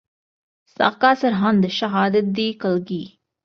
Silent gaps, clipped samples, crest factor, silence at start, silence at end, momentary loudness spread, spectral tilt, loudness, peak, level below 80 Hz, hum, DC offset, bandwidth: none; under 0.1%; 18 dB; 0.8 s; 0.4 s; 10 LU; -6.5 dB/octave; -19 LUFS; -2 dBFS; -62 dBFS; none; under 0.1%; 6.6 kHz